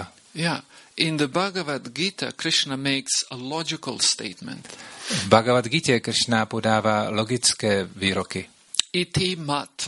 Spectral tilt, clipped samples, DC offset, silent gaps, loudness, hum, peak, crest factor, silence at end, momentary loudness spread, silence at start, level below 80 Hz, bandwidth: -3 dB/octave; under 0.1%; under 0.1%; none; -23 LUFS; none; 0 dBFS; 24 dB; 0 s; 12 LU; 0 s; -58 dBFS; 11.5 kHz